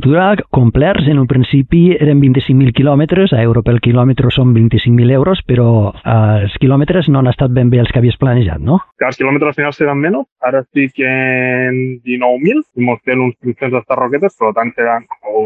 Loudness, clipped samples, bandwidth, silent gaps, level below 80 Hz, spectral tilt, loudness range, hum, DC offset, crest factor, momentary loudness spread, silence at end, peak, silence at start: -12 LUFS; under 0.1%; 4.6 kHz; 10.32-10.36 s; -32 dBFS; -9.5 dB/octave; 4 LU; none; under 0.1%; 10 dB; 6 LU; 0 s; 0 dBFS; 0 s